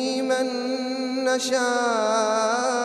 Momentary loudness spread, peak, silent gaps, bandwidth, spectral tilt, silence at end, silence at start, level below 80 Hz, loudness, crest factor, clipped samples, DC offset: 5 LU; -10 dBFS; none; 13.5 kHz; -2 dB/octave; 0 s; 0 s; -78 dBFS; -23 LUFS; 12 dB; under 0.1%; under 0.1%